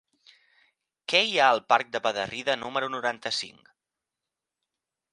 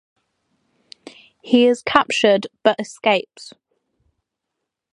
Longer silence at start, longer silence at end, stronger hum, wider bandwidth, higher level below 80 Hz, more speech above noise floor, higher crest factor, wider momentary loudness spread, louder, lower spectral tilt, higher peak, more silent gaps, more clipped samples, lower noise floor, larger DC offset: second, 1.1 s vs 1.45 s; first, 1.65 s vs 1.45 s; neither; about the same, 11.5 kHz vs 11.5 kHz; second, -74 dBFS vs -62 dBFS; about the same, 62 dB vs 63 dB; about the same, 24 dB vs 22 dB; first, 10 LU vs 6 LU; second, -25 LUFS vs -17 LUFS; second, -2 dB/octave vs -4 dB/octave; second, -6 dBFS vs 0 dBFS; neither; neither; first, -88 dBFS vs -80 dBFS; neither